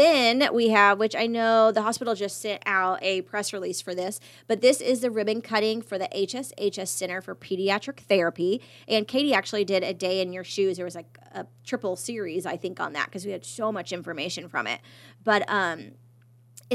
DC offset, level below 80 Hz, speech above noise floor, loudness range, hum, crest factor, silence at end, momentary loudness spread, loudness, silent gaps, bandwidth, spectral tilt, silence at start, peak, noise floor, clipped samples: under 0.1%; -80 dBFS; 30 dB; 8 LU; none; 22 dB; 0 s; 13 LU; -26 LUFS; none; 15 kHz; -3.5 dB/octave; 0 s; -4 dBFS; -56 dBFS; under 0.1%